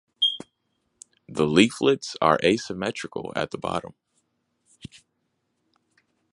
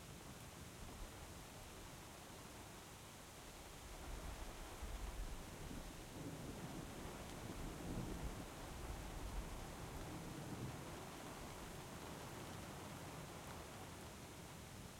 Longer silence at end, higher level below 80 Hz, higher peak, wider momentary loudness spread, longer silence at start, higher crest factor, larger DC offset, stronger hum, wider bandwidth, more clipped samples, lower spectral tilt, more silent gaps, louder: first, 1.45 s vs 0 s; about the same, -58 dBFS vs -56 dBFS; first, -2 dBFS vs -34 dBFS; first, 22 LU vs 5 LU; first, 0.2 s vs 0 s; first, 24 dB vs 16 dB; neither; neither; second, 11.5 kHz vs 16.5 kHz; neither; about the same, -4.5 dB/octave vs -4.5 dB/octave; neither; first, -24 LUFS vs -53 LUFS